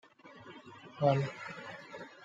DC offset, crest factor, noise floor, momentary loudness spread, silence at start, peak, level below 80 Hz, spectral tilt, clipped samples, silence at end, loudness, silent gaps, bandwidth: under 0.1%; 24 dB; -54 dBFS; 22 LU; 0.25 s; -14 dBFS; -76 dBFS; -7.5 dB/octave; under 0.1%; 0 s; -34 LUFS; none; 7.6 kHz